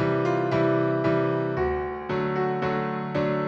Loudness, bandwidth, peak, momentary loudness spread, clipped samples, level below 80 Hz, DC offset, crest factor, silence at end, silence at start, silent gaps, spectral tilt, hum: -25 LUFS; 7.2 kHz; -12 dBFS; 5 LU; under 0.1%; -48 dBFS; under 0.1%; 12 dB; 0 s; 0 s; none; -8.5 dB/octave; none